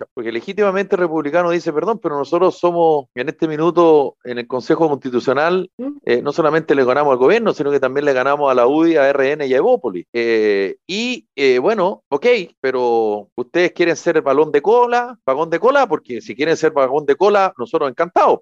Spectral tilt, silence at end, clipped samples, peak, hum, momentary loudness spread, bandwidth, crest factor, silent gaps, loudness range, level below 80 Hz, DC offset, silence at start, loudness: -5.5 dB/octave; 0.05 s; under 0.1%; -4 dBFS; none; 8 LU; 7.6 kHz; 12 dB; 0.11-0.16 s, 5.73-5.78 s, 10.08-10.13 s, 12.06-12.11 s, 12.57-12.63 s, 13.32-13.36 s; 3 LU; -66 dBFS; under 0.1%; 0 s; -16 LUFS